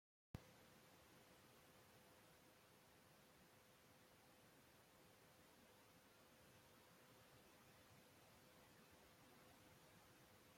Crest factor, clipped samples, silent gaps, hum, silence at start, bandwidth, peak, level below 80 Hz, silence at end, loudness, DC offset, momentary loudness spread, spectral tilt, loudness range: 32 dB; under 0.1%; none; none; 0.35 s; 16.5 kHz; -38 dBFS; -84 dBFS; 0 s; -68 LUFS; under 0.1%; 4 LU; -4 dB/octave; 2 LU